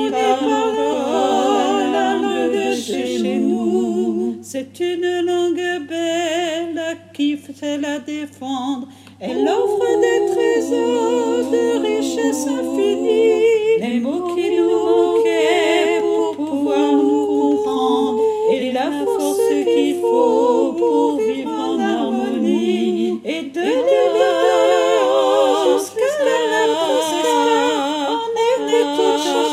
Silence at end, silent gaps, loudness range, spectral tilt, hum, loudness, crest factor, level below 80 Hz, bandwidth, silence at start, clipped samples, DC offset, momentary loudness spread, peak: 0 s; none; 5 LU; -4 dB/octave; none; -18 LUFS; 14 dB; -74 dBFS; 15.5 kHz; 0 s; under 0.1%; under 0.1%; 7 LU; -2 dBFS